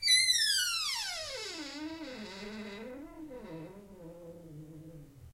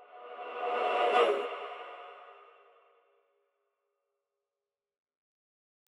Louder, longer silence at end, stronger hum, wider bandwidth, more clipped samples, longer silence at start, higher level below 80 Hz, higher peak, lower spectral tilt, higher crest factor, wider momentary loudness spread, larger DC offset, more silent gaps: about the same, -31 LUFS vs -31 LUFS; second, 0 s vs 3.45 s; neither; first, 16 kHz vs 11 kHz; neither; about the same, 0 s vs 0 s; first, -64 dBFS vs under -90 dBFS; about the same, -16 dBFS vs -14 dBFS; second, -0.5 dB/octave vs -2 dB/octave; about the same, 20 dB vs 22 dB; first, 25 LU vs 22 LU; neither; neither